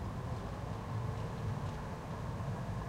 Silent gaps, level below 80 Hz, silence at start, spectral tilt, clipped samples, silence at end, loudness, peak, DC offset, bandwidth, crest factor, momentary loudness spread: none; -50 dBFS; 0 s; -7 dB/octave; under 0.1%; 0 s; -41 LUFS; -26 dBFS; under 0.1%; 15.5 kHz; 14 dB; 3 LU